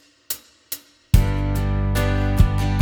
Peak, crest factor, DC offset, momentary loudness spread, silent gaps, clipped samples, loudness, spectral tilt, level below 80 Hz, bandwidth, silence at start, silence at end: 0 dBFS; 20 dB; under 0.1%; 14 LU; none; under 0.1%; -21 LUFS; -6 dB/octave; -24 dBFS; over 20 kHz; 0.3 s; 0 s